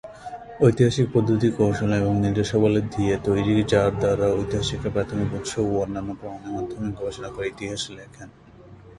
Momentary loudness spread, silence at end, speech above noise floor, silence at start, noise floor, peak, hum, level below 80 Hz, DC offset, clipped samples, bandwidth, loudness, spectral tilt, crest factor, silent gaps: 13 LU; 0.05 s; 24 dB; 0.05 s; -46 dBFS; -4 dBFS; none; -44 dBFS; under 0.1%; under 0.1%; 11.5 kHz; -23 LUFS; -6.5 dB/octave; 20 dB; none